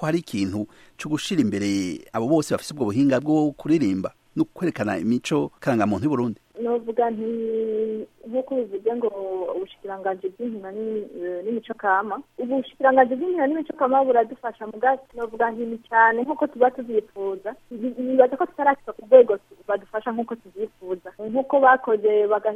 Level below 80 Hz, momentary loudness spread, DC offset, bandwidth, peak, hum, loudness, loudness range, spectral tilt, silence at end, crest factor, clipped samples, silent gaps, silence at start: -64 dBFS; 13 LU; under 0.1%; 13.5 kHz; -2 dBFS; none; -23 LUFS; 6 LU; -6 dB/octave; 0 s; 22 dB; under 0.1%; none; 0 s